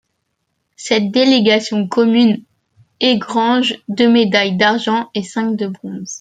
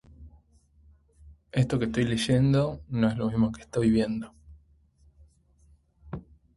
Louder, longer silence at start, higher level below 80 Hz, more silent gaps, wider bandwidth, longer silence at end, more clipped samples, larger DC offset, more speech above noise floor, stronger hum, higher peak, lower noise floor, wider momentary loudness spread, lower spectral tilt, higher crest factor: first, -15 LUFS vs -26 LUFS; first, 0.8 s vs 0.2 s; second, -62 dBFS vs -50 dBFS; neither; second, 9.2 kHz vs 11.5 kHz; second, 0 s vs 0.35 s; neither; neither; first, 56 dB vs 36 dB; neither; first, 0 dBFS vs -10 dBFS; first, -70 dBFS vs -61 dBFS; second, 10 LU vs 19 LU; second, -4.5 dB/octave vs -7 dB/octave; about the same, 14 dB vs 18 dB